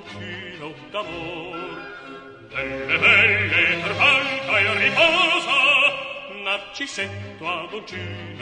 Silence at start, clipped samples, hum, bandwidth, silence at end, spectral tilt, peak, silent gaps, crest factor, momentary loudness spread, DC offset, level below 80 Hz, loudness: 0 s; under 0.1%; none; 10.5 kHz; 0 s; -3.5 dB/octave; -2 dBFS; none; 20 dB; 19 LU; under 0.1%; -56 dBFS; -18 LUFS